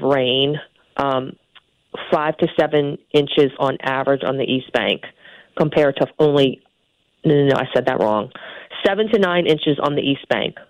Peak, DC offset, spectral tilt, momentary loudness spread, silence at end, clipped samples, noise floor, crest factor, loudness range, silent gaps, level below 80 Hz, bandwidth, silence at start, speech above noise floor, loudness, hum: -6 dBFS; under 0.1%; -7 dB/octave; 13 LU; 0.1 s; under 0.1%; -65 dBFS; 14 dB; 2 LU; none; -56 dBFS; 9.4 kHz; 0 s; 47 dB; -19 LUFS; none